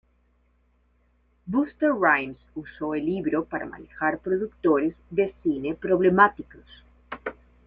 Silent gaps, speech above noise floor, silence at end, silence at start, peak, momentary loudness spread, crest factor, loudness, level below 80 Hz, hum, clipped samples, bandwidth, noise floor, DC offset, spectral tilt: none; 40 dB; 0.35 s; 1.45 s; -4 dBFS; 18 LU; 24 dB; -24 LUFS; -56 dBFS; none; under 0.1%; 4.2 kHz; -65 dBFS; under 0.1%; -9.5 dB/octave